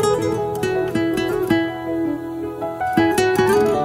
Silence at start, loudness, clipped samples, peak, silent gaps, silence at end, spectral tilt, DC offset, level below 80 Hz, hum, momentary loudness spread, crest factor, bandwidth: 0 s; -20 LUFS; under 0.1%; -2 dBFS; none; 0 s; -5.5 dB/octave; under 0.1%; -46 dBFS; none; 9 LU; 16 dB; 16 kHz